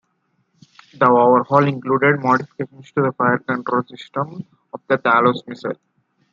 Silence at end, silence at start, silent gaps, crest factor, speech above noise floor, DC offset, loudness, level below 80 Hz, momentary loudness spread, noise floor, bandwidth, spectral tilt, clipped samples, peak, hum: 0.6 s; 1 s; none; 18 dB; 49 dB; under 0.1%; -18 LUFS; -68 dBFS; 16 LU; -67 dBFS; 7.4 kHz; -8 dB/octave; under 0.1%; 0 dBFS; none